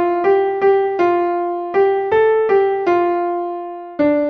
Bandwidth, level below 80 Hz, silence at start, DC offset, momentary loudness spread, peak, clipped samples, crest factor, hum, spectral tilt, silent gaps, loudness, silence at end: 6 kHz; -56 dBFS; 0 s; under 0.1%; 7 LU; -4 dBFS; under 0.1%; 12 dB; none; -7 dB/octave; none; -16 LUFS; 0 s